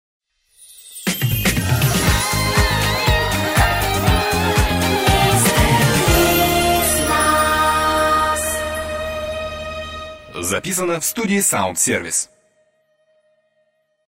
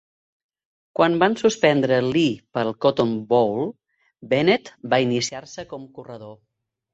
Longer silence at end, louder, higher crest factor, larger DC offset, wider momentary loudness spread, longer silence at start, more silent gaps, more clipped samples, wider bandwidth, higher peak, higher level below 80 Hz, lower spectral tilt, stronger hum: first, 1.85 s vs 0.6 s; first, -17 LUFS vs -21 LUFS; about the same, 18 dB vs 20 dB; neither; second, 11 LU vs 18 LU; second, 0.7 s vs 1 s; neither; neither; first, 16.5 kHz vs 8.2 kHz; about the same, -2 dBFS vs -2 dBFS; first, -28 dBFS vs -62 dBFS; second, -3.5 dB/octave vs -5 dB/octave; neither